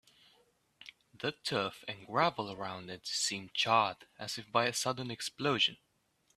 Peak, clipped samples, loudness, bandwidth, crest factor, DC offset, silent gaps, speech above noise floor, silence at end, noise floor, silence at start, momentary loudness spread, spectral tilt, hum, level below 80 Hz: -12 dBFS; under 0.1%; -33 LUFS; 14.5 kHz; 24 dB; under 0.1%; none; 40 dB; 0.6 s; -75 dBFS; 0.85 s; 15 LU; -2.5 dB/octave; none; -76 dBFS